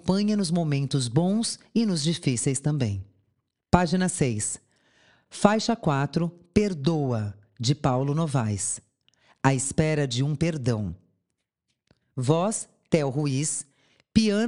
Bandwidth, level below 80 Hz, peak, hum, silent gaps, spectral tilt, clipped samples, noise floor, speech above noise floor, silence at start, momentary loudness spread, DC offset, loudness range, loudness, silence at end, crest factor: 11.5 kHz; -50 dBFS; -2 dBFS; none; none; -5.5 dB/octave; under 0.1%; -81 dBFS; 56 dB; 0.05 s; 7 LU; under 0.1%; 3 LU; -25 LUFS; 0 s; 24 dB